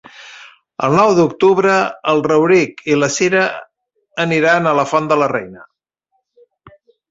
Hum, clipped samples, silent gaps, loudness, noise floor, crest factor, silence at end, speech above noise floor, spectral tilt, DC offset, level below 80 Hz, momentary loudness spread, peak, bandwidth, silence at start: none; under 0.1%; none; -14 LUFS; -69 dBFS; 14 dB; 0.4 s; 55 dB; -5 dB/octave; under 0.1%; -58 dBFS; 19 LU; -2 dBFS; 8 kHz; 0.2 s